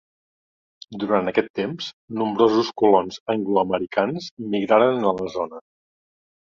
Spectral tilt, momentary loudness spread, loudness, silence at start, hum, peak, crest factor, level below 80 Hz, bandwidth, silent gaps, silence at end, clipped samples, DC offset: -6 dB/octave; 13 LU; -22 LUFS; 0.9 s; none; -2 dBFS; 20 dB; -62 dBFS; 7.4 kHz; 1.50-1.54 s, 1.93-2.08 s, 3.20-3.26 s, 4.31-4.37 s; 1 s; under 0.1%; under 0.1%